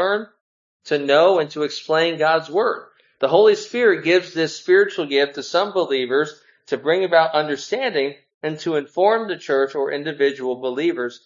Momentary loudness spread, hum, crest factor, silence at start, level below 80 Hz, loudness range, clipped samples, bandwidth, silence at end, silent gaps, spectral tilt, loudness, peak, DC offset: 10 LU; none; 18 dB; 0 s; -76 dBFS; 4 LU; under 0.1%; 7.6 kHz; 0.1 s; 0.41-0.80 s, 8.34-8.41 s; -4.5 dB/octave; -19 LUFS; -2 dBFS; under 0.1%